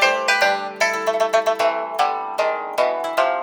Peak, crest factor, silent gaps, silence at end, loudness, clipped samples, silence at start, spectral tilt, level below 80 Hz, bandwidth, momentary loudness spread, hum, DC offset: -2 dBFS; 18 dB; none; 0 s; -20 LUFS; under 0.1%; 0 s; -1 dB/octave; -74 dBFS; over 20 kHz; 5 LU; none; under 0.1%